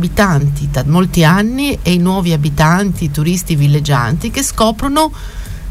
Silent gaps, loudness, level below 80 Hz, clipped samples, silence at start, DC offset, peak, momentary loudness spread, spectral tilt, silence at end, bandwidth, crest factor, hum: none; -13 LUFS; -26 dBFS; under 0.1%; 0 s; under 0.1%; 0 dBFS; 6 LU; -5.5 dB/octave; 0 s; 16 kHz; 12 dB; none